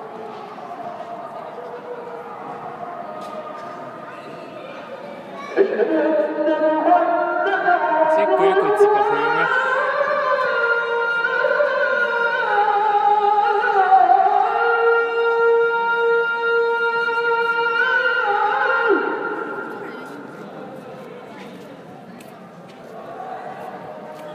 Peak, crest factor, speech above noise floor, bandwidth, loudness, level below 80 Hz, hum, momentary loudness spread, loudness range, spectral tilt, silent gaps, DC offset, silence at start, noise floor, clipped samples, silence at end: -4 dBFS; 16 dB; 23 dB; 10.5 kHz; -18 LUFS; -78 dBFS; none; 19 LU; 16 LU; -5 dB/octave; none; under 0.1%; 0 s; -40 dBFS; under 0.1%; 0 s